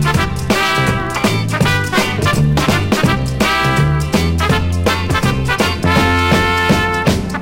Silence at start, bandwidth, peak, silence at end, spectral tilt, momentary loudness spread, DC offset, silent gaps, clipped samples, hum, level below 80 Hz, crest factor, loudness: 0 s; 16.5 kHz; -2 dBFS; 0 s; -5 dB/octave; 3 LU; under 0.1%; none; under 0.1%; none; -26 dBFS; 12 dB; -14 LUFS